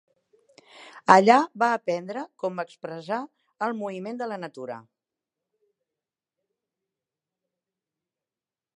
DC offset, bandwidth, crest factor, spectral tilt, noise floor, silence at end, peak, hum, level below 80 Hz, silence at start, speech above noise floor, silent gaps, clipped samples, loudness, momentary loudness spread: under 0.1%; 10 kHz; 28 dB; -5 dB/octave; under -90 dBFS; 3.95 s; 0 dBFS; none; -80 dBFS; 0.8 s; over 66 dB; none; under 0.1%; -24 LUFS; 20 LU